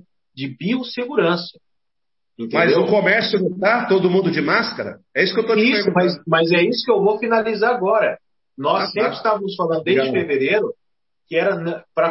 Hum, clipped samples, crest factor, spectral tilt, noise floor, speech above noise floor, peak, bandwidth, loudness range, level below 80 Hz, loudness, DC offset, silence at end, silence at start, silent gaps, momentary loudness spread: none; under 0.1%; 18 dB; -8.5 dB/octave; -83 dBFS; 65 dB; -2 dBFS; 6 kHz; 3 LU; -66 dBFS; -18 LUFS; under 0.1%; 0 s; 0.35 s; none; 9 LU